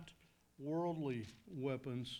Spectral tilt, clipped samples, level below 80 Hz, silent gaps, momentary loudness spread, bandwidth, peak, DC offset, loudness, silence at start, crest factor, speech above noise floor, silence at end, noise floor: -7 dB/octave; under 0.1%; -74 dBFS; none; 11 LU; 19 kHz; -28 dBFS; under 0.1%; -43 LUFS; 0 s; 16 dB; 26 dB; 0 s; -68 dBFS